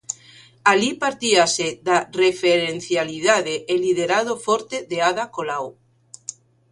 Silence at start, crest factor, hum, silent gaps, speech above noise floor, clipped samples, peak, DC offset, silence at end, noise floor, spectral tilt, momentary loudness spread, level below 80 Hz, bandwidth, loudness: 0.1 s; 20 dB; none; none; 29 dB; under 0.1%; 0 dBFS; under 0.1%; 1 s; -49 dBFS; -2.5 dB/octave; 15 LU; -62 dBFS; 11.5 kHz; -20 LUFS